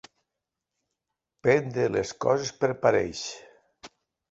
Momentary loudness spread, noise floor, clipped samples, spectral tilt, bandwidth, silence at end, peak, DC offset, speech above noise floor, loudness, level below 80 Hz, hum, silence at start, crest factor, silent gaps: 11 LU; -86 dBFS; under 0.1%; -5 dB/octave; 8 kHz; 0.45 s; -6 dBFS; under 0.1%; 61 dB; -26 LUFS; -60 dBFS; none; 1.45 s; 22 dB; none